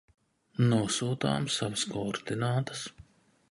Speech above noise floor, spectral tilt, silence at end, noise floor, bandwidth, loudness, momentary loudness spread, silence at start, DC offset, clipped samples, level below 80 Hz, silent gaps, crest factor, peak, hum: 27 dB; -5 dB/octave; 0.5 s; -57 dBFS; 11.5 kHz; -30 LUFS; 11 LU; 0.6 s; under 0.1%; under 0.1%; -62 dBFS; none; 18 dB; -14 dBFS; none